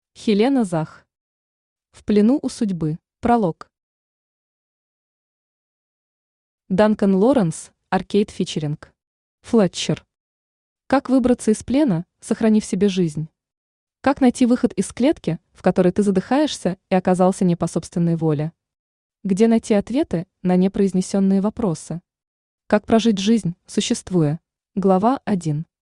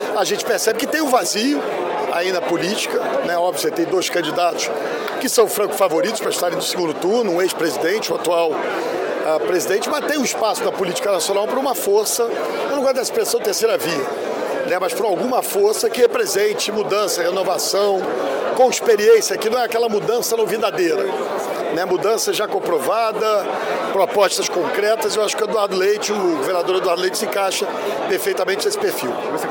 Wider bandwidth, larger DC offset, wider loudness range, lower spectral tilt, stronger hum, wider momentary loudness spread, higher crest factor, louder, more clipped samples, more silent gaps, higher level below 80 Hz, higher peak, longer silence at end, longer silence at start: second, 11 kHz vs 17 kHz; neither; about the same, 4 LU vs 3 LU; first, -6.5 dB/octave vs -2.5 dB/octave; neither; first, 9 LU vs 5 LU; about the same, 18 dB vs 16 dB; about the same, -20 LUFS vs -19 LUFS; neither; first, 1.21-1.76 s, 3.83-6.58 s, 9.07-9.38 s, 10.20-10.76 s, 13.57-13.87 s, 18.79-19.10 s, 22.27-22.58 s vs none; first, -52 dBFS vs -68 dBFS; about the same, -2 dBFS vs -4 dBFS; first, 0.2 s vs 0 s; first, 0.2 s vs 0 s